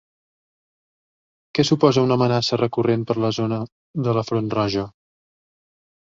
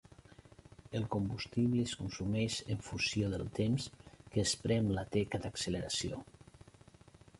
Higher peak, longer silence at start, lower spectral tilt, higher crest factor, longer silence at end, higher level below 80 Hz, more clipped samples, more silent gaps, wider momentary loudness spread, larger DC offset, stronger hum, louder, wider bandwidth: first, -2 dBFS vs -20 dBFS; first, 1.55 s vs 0.9 s; first, -6.5 dB/octave vs -5 dB/octave; about the same, 20 dB vs 18 dB; first, 1.15 s vs 0.8 s; about the same, -56 dBFS vs -56 dBFS; neither; first, 3.72-3.94 s vs none; first, 11 LU vs 7 LU; neither; neither; first, -21 LUFS vs -36 LUFS; second, 7.6 kHz vs 11.5 kHz